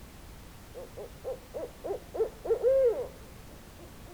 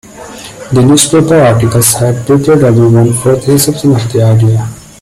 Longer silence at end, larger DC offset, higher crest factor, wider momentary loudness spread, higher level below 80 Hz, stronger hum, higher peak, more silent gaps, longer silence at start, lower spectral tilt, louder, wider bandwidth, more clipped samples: second, 0 s vs 0.2 s; neither; first, 16 dB vs 8 dB; first, 23 LU vs 12 LU; second, -52 dBFS vs -38 dBFS; neither; second, -16 dBFS vs 0 dBFS; neither; second, 0 s vs 0.15 s; about the same, -5.5 dB/octave vs -5.5 dB/octave; second, -31 LUFS vs -8 LUFS; first, over 20 kHz vs 16 kHz; second, under 0.1% vs 0.1%